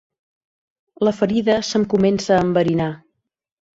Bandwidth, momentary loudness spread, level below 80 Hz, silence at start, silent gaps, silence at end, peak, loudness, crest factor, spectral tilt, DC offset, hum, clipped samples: 8 kHz; 6 LU; -52 dBFS; 1 s; none; 0.85 s; -4 dBFS; -18 LUFS; 16 dB; -6 dB/octave; under 0.1%; none; under 0.1%